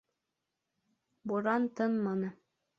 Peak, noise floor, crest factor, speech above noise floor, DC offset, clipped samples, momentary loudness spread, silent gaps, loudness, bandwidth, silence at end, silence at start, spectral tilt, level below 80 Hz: -16 dBFS; -87 dBFS; 18 dB; 55 dB; under 0.1%; under 0.1%; 9 LU; none; -33 LUFS; 7 kHz; 0.45 s; 1.25 s; -8.5 dB/octave; -80 dBFS